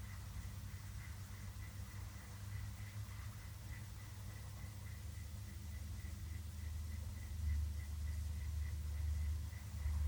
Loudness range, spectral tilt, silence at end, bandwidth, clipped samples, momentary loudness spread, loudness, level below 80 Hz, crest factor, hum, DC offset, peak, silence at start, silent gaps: 6 LU; -5 dB/octave; 0 s; over 20 kHz; under 0.1%; 8 LU; -48 LUFS; -48 dBFS; 14 dB; none; under 0.1%; -32 dBFS; 0 s; none